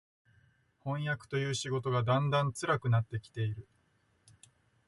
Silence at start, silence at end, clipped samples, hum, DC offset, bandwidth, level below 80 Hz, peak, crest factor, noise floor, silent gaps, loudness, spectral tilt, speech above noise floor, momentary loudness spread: 0.85 s; 1.25 s; under 0.1%; none; under 0.1%; 11.5 kHz; -64 dBFS; -16 dBFS; 18 dB; -72 dBFS; none; -33 LUFS; -5.5 dB/octave; 40 dB; 10 LU